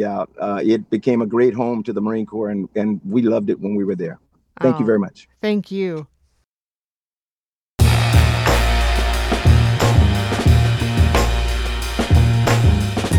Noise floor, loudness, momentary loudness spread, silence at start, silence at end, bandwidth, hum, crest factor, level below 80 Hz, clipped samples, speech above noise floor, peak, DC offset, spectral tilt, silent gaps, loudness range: under -90 dBFS; -18 LUFS; 9 LU; 0 s; 0 s; 17 kHz; none; 16 dB; -24 dBFS; under 0.1%; over 71 dB; -2 dBFS; under 0.1%; -6.5 dB/octave; 6.45-7.76 s; 7 LU